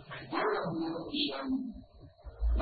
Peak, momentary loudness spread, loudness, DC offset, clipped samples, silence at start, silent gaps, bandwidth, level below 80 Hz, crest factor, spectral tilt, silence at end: -18 dBFS; 18 LU; -35 LUFS; under 0.1%; under 0.1%; 0 s; none; 4.8 kHz; -40 dBFS; 16 dB; -4 dB/octave; 0 s